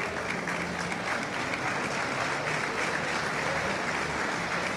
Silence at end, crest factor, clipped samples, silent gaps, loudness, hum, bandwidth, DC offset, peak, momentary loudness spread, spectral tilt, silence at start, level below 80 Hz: 0 s; 14 dB; under 0.1%; none; -30 LUFS; none; 16 kHz; under 0.1%; -16 dBFS; 2 LU; -3.5 dB/octave; 0 s; -56 dBFS